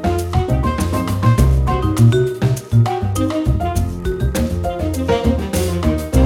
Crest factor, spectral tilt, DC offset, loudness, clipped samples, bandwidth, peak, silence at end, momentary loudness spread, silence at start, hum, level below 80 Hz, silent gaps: 14 dB; -7 dB/octave; under 0.1%; -17 LUFS; under 0.1%; 16.5 kHz; 0 dBFS; 0 s; 7 LU; 0 s; none; -22 dBFS; none